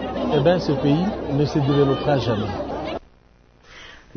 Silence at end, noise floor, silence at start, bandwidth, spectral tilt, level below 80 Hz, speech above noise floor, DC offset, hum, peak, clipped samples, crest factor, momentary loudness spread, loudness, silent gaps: 0.2 s; -53 dBFS; 0 s; 6.6 kHz; -7.5 dB/octave; -42 dBFS; 34 dB; under 0.1%; none; -4 dBFS; under 0.1%; 18 dB; 12 LU; -21 LUFS; none